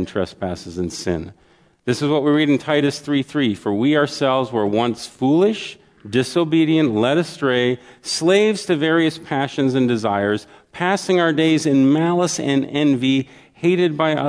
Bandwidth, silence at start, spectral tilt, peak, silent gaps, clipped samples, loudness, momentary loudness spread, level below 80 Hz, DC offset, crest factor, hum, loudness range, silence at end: 11 kHz; 0 s; -5.5 dB/octave; -4 dBFS; none; under 0.1%; -19 LUFS; 9 LU; -56 dBFS; under 0.1%; 16 dB; none; 2 LU; 0 s